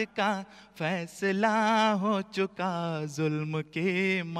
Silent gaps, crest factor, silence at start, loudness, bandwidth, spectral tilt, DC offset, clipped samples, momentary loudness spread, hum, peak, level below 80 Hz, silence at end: none; 16 dB; 0 s; -29 LUFS; 13.5 kHz; -5.5 dB/octave; under 0.1%; under 0.1%; 9 LU; none; -14 dBFS; -72 dBFS; 0 s